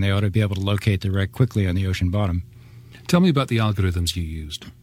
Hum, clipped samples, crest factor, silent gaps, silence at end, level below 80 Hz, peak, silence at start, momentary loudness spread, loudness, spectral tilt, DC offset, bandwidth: none; under 0.1%; 18 dB; none; 0.1 s; -40 dBFS; -4 dBFS; 0 s; 11 LU; -22 LUFS; -6.5 dB/octave; under 0.1%; 15.5 kHz